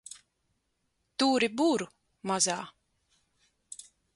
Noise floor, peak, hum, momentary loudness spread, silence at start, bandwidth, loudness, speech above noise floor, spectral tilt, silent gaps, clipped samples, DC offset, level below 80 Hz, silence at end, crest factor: -78 dBFS; -12 dBFS; none; 21 LU; 1.2 s; 11.5 kHz; -28 LUFS; 50 dB; -2.5 dB/octave; none; under 0.1%; under 0.1%; -74 dBFS; 0.35 s; 20 dB